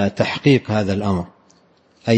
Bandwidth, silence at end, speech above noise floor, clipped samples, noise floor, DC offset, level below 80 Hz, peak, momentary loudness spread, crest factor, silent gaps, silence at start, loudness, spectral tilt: 8.6 kHz; 0 s; 38 dB; under 0.1%; -56 dBFS; under 0.1%; -52 dBFS; -2 dBFS; 12 LU; 18 dB; none; 0 s; -19 LUFS; -7 dB/octave